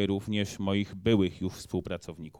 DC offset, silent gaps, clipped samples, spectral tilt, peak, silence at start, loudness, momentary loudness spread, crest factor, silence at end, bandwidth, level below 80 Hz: under 0.1%; none; under 0.1%; -6 dB/octave; -12 dBFS; 0 s; -30 LUFS; 11 LU; 18 dB; 0.1 s; 16 kHz; -56 dBFS